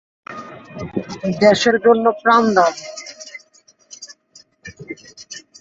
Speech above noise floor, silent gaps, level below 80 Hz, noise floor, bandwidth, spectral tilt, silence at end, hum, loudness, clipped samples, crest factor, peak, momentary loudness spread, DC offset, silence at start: 38 dB; none; -56 dBFS; -54 dBFS; 7.8 kHz; -4.5 dB/octave; 0.2 s; none; -15 LUFS; under 0.1%; 18 dB; -2 dBFS; 24 LU; under 0.1%; 0.3 s